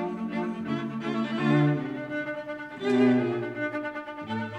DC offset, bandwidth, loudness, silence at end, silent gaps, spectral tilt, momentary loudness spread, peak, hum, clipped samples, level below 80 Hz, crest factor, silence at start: under 0.1%; 8.8 kHz; -28 LUFS; 0 s; none; -8 dB/octave; 11 LU; -10 dBFS; none; under 0.1%; -70 dBFS; 16 dB; 0 s